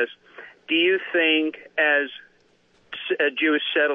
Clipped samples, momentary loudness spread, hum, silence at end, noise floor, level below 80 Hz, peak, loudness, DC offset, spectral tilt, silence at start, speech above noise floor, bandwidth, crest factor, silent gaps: under 0.1%; 19 LU; 60 Hz at -75 dBFS; 0 s; -61 dBFS; -82 dBFS; -8 dBFS; -21 LUFS; under 0.1%; -5 dB/octave; 0 s; 38 dB; 4.6 kHz; 16 dB; none